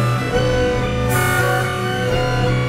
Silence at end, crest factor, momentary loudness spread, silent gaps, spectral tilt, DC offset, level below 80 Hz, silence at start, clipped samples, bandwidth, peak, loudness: 0 s; 14 dB; 3 LU; none; -5.5 dB/octave; under 0.1%; -30 dBFS; 0 s; under 0.1%; 16.5 kHz; -4 dBFS; -18 LUFS